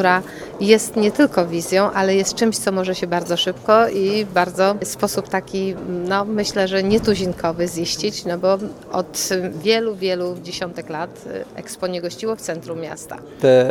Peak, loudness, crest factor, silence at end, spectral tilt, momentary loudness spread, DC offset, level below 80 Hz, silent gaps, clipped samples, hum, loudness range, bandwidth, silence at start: 0 dBFS; -20 LUFS; 20 dB; 0 s; -4 dB/octave; 12 LU; under 0.1%; -50 dBFS; none; under 0.1%; none; 6 LU; 18.5 kHz; 0 s